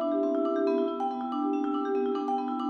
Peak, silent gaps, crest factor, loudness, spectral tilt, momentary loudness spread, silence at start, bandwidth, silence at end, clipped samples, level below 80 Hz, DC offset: -16 dBFS; none; 12 dB; -29 LUFS; -6 dB/octave; 4 LU; 0 s; 6.4 kHz; 0 s; under 0.1%; -74 dBFS; under 0.1%